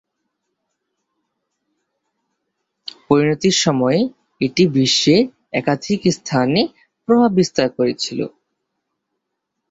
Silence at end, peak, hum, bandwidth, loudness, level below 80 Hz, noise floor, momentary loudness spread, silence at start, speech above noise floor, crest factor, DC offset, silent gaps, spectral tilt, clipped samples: 1.4 s; -2 dBFS; none; 8 kHz; -17 LUFS; -58 dBFS; -77 dBFS; 11 LU; 3.1 s; 61 dB; 18 dB; under 0.1%; none; -5 dB/octave; under 0.1%